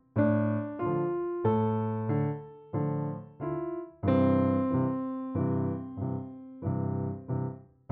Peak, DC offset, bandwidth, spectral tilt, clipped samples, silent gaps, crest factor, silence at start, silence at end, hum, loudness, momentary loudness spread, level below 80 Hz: -14 dBFS; under 0.1%; 4.3 kHz; -9.5 dB/octave; under 0.1%; none; 16 dB; 0.15 s; 0.3 s; none; -31 LUFS; 11 LU; -62 dBFS